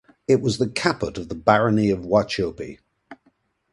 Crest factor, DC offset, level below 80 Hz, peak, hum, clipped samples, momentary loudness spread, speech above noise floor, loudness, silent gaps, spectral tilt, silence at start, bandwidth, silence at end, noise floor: 22 dB; under 0.1%; -50 dBFS; 0 dBFS; none; under 0.1%; 11 LU; 44 dB; -21 LUFS; none; -6 dB/octave; 0.3 s; 11.5 kHz; 0.6 s; -64 dBFS